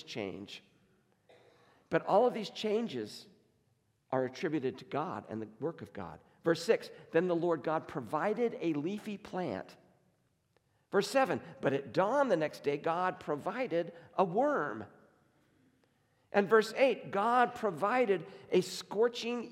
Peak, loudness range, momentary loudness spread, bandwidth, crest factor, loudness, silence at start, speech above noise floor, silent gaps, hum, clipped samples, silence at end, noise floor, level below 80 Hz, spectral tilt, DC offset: -14 dBFS; 6 LU; 13 LU; 15.5 kHz; 20 dB; -33 LUFS; 0.05 s; 42 dB; none; none; under 0.1%; 0 s; -75 dBFS; -80 dBFS; -5.5 dB/octave; under 0.1%